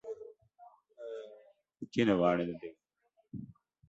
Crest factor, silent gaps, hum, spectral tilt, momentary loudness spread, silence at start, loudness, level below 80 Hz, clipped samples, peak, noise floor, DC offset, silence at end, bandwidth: 22 dB; none; none; -7 dB/octave; 23 LU; 0.05 s; -32 LUFS; -68 dBFS; under 0.1%; -16 dBFS; -76 dBFS; under 0.1%; 0.35 s; 8 kHz